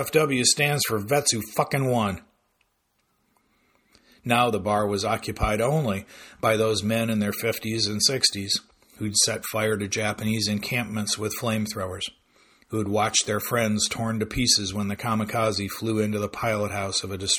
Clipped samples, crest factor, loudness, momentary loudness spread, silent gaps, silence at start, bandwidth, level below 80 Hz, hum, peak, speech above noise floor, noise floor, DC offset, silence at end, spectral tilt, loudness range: under 0.1%; 20 dB; -24 LUFS; 8 LU; none; 0 s; 19.5 kHz; -48 dBFS; none; -4 dBFS; 47 dB; -71 dBFS; under 0.1%; 0 s; -3.5 dB/octave; 4 LU